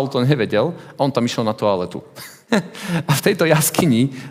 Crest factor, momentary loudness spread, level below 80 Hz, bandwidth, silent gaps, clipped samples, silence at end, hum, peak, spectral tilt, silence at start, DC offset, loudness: 18 dB; 10 LU; -58 dBFS; 16.5 kHz; none; under 0.1%; 0 s; none; 0 dBFS; -5 dB/octave; 0 s; under 0.1%; -18 LUFS